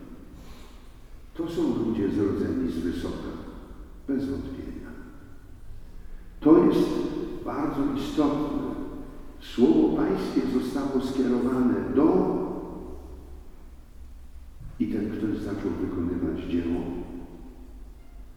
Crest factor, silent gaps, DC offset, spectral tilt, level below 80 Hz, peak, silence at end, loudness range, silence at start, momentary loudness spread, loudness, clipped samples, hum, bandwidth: 22 dB; none; under 0.1%; -7.5 dB/octave; -44 dBFS; -6 dBFS; 0 s; 8 LU; 0 s; 23 LU; -26 LUFS; under 0.1%; none; 15 kHz